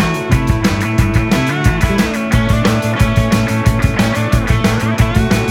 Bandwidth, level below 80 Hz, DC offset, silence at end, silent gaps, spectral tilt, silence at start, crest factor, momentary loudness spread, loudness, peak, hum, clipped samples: 17 kHz; -22 dBFS; under 0.1%; 0 s; none; -6 dB/octave; 0 s; 12 dB; 2 LU; -14 LUFS; 0 dBFS; none; under 0.1%